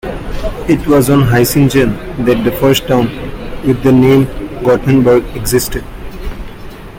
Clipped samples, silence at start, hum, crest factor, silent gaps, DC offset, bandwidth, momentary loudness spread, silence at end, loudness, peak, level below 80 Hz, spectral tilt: under 0.1%; 0.05 s; none; 12 dB; none; under 0.1%; 17 kHz; 18 LU; 0 s; -11 LUFS; 0 dBFS; -26 dBFS; -6 dB/octave